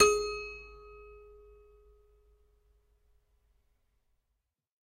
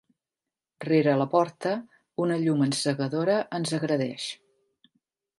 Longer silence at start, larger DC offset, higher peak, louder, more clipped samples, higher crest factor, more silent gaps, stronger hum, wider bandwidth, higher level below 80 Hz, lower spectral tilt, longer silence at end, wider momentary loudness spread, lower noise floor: second, 0 s vs 0.8 s; neither; about the same, -10 dBFS vs -10 dBFS; second, -31 LUFS vs -26 LUFS; neither; first, 28 dB vs 18 dB; neither; neither; first, 15.5 kHz vs 11.5 kHz; first, -58 dBFS vs -76 dBFS; second, -1 dB/octave vs -5.5 dB/octave; first, 3.95 s vs 1.05 s; first, 25 LU vs 12 LU; second, -83 dBFS vs -90 dBFS